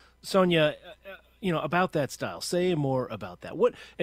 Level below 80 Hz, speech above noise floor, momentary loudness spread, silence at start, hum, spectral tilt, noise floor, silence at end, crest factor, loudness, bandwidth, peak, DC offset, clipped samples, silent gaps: -60 dBFS; 21 dB; 17 LU; 0.25 s; none; -5.5 dB/octave; -48 dBFS; 0 s; 18 dB; -27 LUFS; 16 kHz; -10 dBFS; under 0.1%; under 0.1%; none